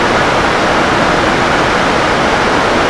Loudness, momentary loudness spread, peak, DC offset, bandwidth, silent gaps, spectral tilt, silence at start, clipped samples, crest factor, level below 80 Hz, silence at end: -11 LUFS; 0 LU; 0 dBFS; under 0.1%; 11 kHz; none; -4 dB/octave; 0 s; under 0.1%; 12 dB; -30 dBFS; 0 s